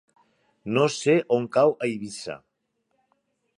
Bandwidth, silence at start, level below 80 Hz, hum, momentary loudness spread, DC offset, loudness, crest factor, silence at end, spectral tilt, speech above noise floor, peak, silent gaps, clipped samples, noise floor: 11.5 kHz; 0.65 s; -70 dBFS; none; 17 LU; under 0.1%; -23 LUFS; 18 dB; 1.2 s; -5.5 dB/octave; 52 dB; -8 dBFS; none; under 0.1%; -75 dBFS